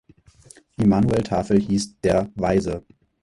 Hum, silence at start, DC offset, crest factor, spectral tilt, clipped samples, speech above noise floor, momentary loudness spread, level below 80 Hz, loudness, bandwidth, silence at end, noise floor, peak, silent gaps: none; 0.8 s; under 0.1%; 16 dB; -7 dB/octave; under 0.1%; 30 dB; 10 LU; -42 dBFS; -21 LUFS; 11.5 kHz; 0.45 s; -50 dBFS; -6 dBFS; none